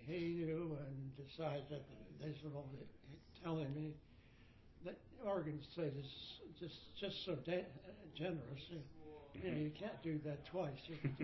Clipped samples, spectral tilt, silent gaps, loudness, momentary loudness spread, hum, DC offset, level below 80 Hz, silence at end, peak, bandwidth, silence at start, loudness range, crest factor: under 0.1%; -6 dB/octave; none; -47 LUFS; 14 LU; none; under 0.1%; -70 dBFS; 0 s; -28 dBFS; 6 kHz; 0 s; 3 LU; 18 dB